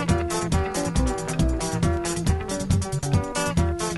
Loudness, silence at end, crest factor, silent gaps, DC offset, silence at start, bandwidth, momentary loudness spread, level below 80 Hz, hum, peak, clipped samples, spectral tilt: -25 LUFS; 0 s; 16 dB; none; under 0.1%; 0 s; 12 kHz; 1 LU; -30 dBFS; none; -8 dBFS; under 0.1%; -5.5 dB/octave